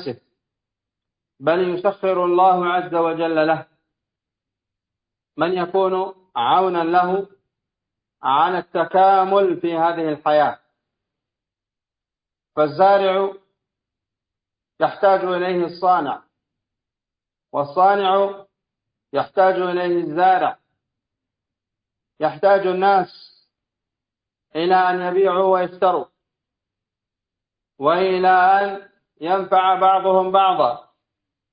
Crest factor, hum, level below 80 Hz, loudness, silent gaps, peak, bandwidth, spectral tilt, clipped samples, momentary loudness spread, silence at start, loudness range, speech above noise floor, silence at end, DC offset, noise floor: 18 dB; none; -70 dBFS; -18 LUFS; none; -2 dBFS; 5.2 kHz; -10 dB/octave; under 0.1%; 11 LU; 0 s; 4 LU; 70 dB; 0.75 s; under 0.1%; -88 dBFS